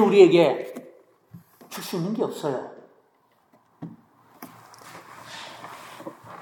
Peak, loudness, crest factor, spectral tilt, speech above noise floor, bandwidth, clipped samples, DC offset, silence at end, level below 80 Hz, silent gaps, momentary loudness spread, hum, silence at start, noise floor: -2 dBFS; -21 LUFS; 24 dB; -6 dB/octave; 44 dB; 17.5 kHz; under 0.1%; under 0.1%; 0.05 s; -80 dBFS; none; 28 LU; none; 0 s; -64 dBFS